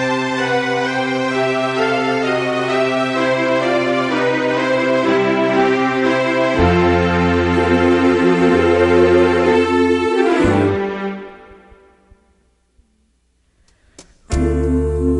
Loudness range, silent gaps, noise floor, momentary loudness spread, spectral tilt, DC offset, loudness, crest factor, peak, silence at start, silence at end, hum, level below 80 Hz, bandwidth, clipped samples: 11 LU; none; -61 dBFS; 5 LU; -6 dB/octave; under 0.1%; -15 LUFS; 14 dB; -2 dBFS; 0 s; 0 s; none; -32 dBFS; 11 kHz; under 0.1%